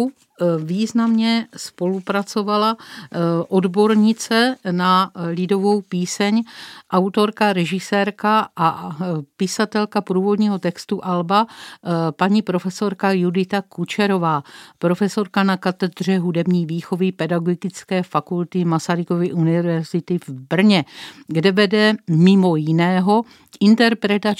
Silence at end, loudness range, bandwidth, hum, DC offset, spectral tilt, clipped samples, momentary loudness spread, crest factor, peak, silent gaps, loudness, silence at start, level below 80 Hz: 0.05 s; 4 LU; 14.5 kHz; none; under 0.1%; -6 dB/octave; under 0.1%; 9 LU; 18 dB; -2 dBFS; none; -19 LUFS; 0 s; -72 dBFS